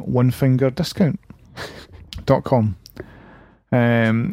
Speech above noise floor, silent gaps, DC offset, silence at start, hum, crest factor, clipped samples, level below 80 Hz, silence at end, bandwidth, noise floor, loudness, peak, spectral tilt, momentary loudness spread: 29 dB; none; under 0.1%; 0 s; none; 18 dB; under 0.1%; -46 dBFS; 0 s; 15.5 kHz; -47 dBFS; -19 LUFS; -2 dBFS; -7.5 dB/octave; 21 LU